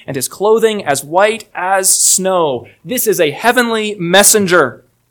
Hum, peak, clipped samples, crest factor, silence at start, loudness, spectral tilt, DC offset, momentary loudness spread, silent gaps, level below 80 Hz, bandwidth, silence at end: none; 0 dBFS; 0.4%; 14 dB; 0.1 s; -12 LUFS; -2 dB/octave; under 0.1%; 10 LU; none; -56 dBFS; over 20 kHz; 0.35 s